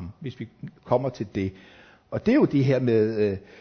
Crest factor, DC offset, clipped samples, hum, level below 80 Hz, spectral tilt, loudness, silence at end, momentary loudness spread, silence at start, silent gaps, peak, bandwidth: 18 dB; under 0.1%; under 0.1%; none; -52 dBFS; -9 dB/octave; -24 LUFS; 0.2 s; 17 LU; 0 s; none; -8 dBFS; 6.6 kHz